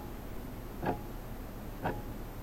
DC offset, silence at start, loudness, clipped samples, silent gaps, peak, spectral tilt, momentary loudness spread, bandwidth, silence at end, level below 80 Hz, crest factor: 0.1%; 0 s; -41 LUFS; under 0.1%; none; -18 dBFS; -6.5 dB/octave; 7 LU; 16 kHz; 0 s; -46 dBFS; 20 dB